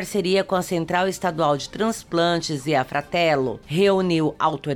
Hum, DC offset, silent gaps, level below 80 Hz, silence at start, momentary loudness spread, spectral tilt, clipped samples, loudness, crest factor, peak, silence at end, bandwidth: none; under 0.1%; none; -52 dBFS; 0 s; 5 LU; -5 dB/octave; under 0.1%; -22 LUFS; 14 dB; -6 dBFS; 0 s; 18 kHz